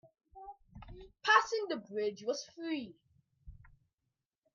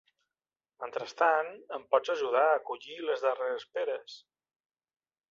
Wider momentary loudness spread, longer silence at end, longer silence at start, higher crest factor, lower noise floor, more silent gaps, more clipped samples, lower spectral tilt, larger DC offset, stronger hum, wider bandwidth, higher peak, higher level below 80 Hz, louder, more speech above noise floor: first, 26 LU vs 14 LU; second, 0.9 s vs 1.15 s; second, 0.35 s vs 0.8 s; first, 26 dB vs 20 dB; about the same, -87 dBFS vs under -90 dBFS; neither; neither; about the same, -3 dB/octave vs -3 dB/octave; neither; neither; about the same, 7.4 kHz vs 7.4 kHz; about the same, -12 dBFS vs -12 dBFS; first, -62 dBFS vs -84 dBFS; second, -34 LUFS vs -31 LUFS; second, 49 dB vs over 59 dB